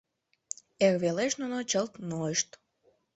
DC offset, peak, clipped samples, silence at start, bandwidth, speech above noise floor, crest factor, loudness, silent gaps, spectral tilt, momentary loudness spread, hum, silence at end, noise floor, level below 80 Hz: under 0.1%; -10 dBFS; under 0.1%; 0.8 s; 8.4 kHz; 41 dB; 22 dB; -30 LUFS; none; -3.5 dB/octave; 15 LU; none; 0.7 s; -70 dBFS; -72 dBFS